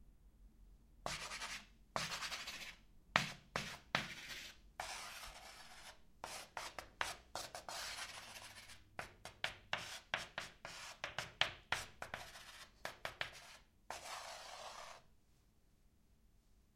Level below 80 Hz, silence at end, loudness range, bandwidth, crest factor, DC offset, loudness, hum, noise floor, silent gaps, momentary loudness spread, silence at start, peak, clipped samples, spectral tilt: -68 dBFS; 0.1 s; 7 LU; 16 kHz; 38 dB; under 0.1%; -46 LUFS; none; -72 dBFS; none; 15 LU; 0 s; -10 dBFS; under 0.1%; -1.5 dB/octave